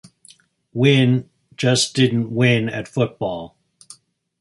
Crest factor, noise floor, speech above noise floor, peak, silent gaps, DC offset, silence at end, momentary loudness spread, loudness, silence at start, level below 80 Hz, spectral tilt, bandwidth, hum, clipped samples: 18 dB; -52 dBFS; 34 dB; -2 dBFS; none; under 0.1%; 0.95 s; 12 LU; -18 LUFS; 0.75 s; -56 dBFS; -5 dB/octave; 11.5 kHz; none; under 0.1%